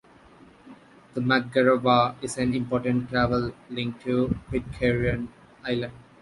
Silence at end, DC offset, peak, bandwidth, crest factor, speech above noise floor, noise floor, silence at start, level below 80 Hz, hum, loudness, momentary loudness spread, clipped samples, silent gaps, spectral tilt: 0.2 s; under 0.1%; -6 dBFS; 11.5 kHz; 20 dB; 28 dB; -52 dBFS; 0.65 s; -46 dBFS; none; -25 LUFS; 11 LU; under 0.1%; none; -6 dB/octave